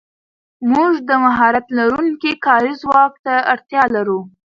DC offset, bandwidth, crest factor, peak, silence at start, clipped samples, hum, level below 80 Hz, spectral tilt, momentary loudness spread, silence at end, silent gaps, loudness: under 0.1%; 7.4 kHz; 16 dB; 0 dBFS; 0.6 s; under 0.1%; none; -56 dBFS; -6 dB/octave; 5 LU; 0.2 s; 3.19-3.24 s; -15 LUFS